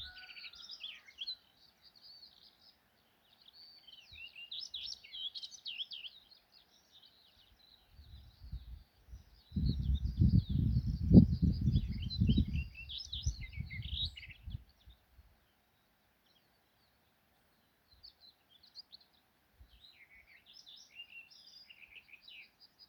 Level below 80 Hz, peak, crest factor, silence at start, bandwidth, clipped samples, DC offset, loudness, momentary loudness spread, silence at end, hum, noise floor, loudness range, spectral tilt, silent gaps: -46 dBFS; -10 dBFS; 28 dB; 0 s; 14.5 kHz; under 0.1%; under 0.1%; -35 LUFS; 25 LU; 0.45 s; none; -74 dBFS; 25 LU; -7 dB/octave; none